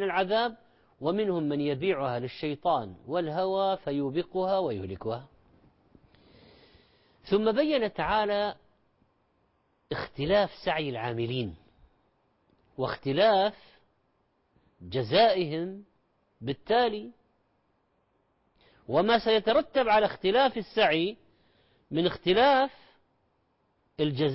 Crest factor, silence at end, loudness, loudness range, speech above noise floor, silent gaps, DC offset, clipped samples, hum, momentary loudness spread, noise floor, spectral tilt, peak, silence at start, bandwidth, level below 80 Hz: 18 dB; 0 s; -28 LUFS; 6 LU; 45 dB; none; under 0.1%; under 0.1%; none; 12 LU; -72 dBFS; -9.5 dB/octave; -12 dBFS; 0 s; 5.8 kHz; -58 dBFS